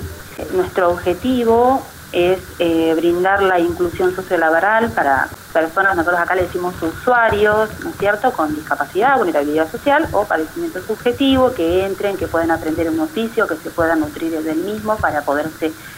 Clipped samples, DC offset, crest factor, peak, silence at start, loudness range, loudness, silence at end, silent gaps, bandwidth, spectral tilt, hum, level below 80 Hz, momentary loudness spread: under 0.1%; under 0.1%; 14 dB; -4 dBFS; 0 s; 3 LU; -17 LUFS; 0 s; none; 16 kHz; -5.5 dB/octave; none; -42 dBFS; 7 LU